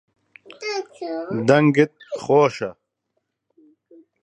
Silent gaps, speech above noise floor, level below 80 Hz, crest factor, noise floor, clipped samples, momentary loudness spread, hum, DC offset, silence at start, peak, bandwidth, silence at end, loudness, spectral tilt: none; 56 dB; -68 dBFS; 20 dB; -75 dBFS; under 0.1%; 16 LU; none; under 0.1%; 0.6 s; -2 dBFS; 8.8 kHz; 1.5 s; -20 LUFS; -6.5 dB/octave